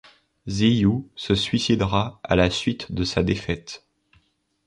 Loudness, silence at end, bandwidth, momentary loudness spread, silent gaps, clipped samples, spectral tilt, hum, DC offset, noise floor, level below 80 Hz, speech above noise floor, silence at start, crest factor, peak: -23 LUFS; 0.9 s; 11.5 kHz; 12 LU; none; under 0.1%; -5.5 dB/octave; none; under 0.1%; -65 dBFS; -42 dBFS; 42 dB; 0.45 s; 20 dB; -4 dBFS